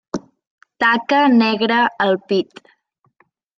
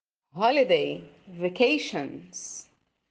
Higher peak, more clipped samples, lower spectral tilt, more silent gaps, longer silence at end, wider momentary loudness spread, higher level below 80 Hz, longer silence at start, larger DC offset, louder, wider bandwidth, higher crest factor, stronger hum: first, -2 dBFS vs -8 dBFS; neither; first, -5.5 dB/octave vs -3.5 dB/octave; first, 0.47-0.58 s vs none; first, 1.15 s vs 0.5 s; second, 15 LU vs 18 LU; first, -66 dBFS vs -72 dBFS; second, 0.15 s vs 0.35 s; neither; first, -16 LUFS vs -25 LUFS; second, 7.6 kHz vs 9.6 kHz; about the same, 16 dB vs 20 dB; neither